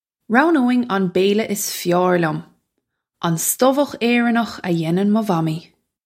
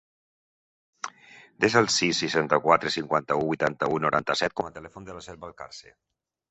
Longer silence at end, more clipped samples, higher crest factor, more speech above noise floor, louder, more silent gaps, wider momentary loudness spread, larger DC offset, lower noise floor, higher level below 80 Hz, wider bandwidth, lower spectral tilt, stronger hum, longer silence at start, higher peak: second, 0.45 s vs 0.7 s; neither; second, 18 dB vs 24 dB; first, 58 dB vs 22 dB; first, -18 LUFS vs -24 LUFS; neither; second, 7 LU vs 20 LU; neither; first, -76 dBFS vs -48 dBFS; about the same, -66 dBFS vs -62 dBFS; first, 16.5 kHz vs 8.4 kHz; first, -5 dB/octave vs -3.5 dB/octave; neither; second, 0.3 s vs 1.05 s; first, 0 dBFS vs -4 dBFS